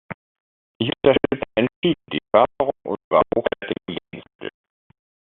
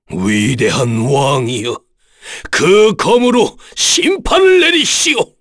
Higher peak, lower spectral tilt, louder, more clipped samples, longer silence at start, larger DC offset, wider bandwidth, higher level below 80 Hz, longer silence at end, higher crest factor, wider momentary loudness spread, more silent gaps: about the same, -2 dBFS vs 0 dBFS; about the same, -4 dB/octave vs -3.5 dB/octave; second, -21 LUFS vs -11 LUFS; neither; about the same, 0.1 s vs 0.1 s; neither; second, 4.1 kHz vs 11 kHz; second, -54 dBFS vs -36 dBFS; first, 0.85 s vs 0.15 s; first, 22 dB vs 12 dB; first, 18 LU vs 10 LU; first, 0.14-0.80 s, 1.76-1.82 s, 3.04-3.11 s, 4.35-4.39 s vs none